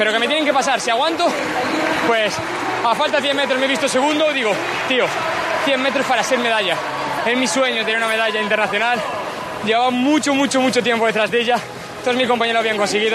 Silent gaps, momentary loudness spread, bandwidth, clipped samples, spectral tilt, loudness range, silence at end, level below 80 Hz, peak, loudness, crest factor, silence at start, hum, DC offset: none; 5 LU; 13.5 kHz; under 0.1%; -3 dB/octave; 1 LU; 0 s; -58 dBFS; -4 dBFS; -17 LUFS; 14 dB; 0 s; none; under 0.1%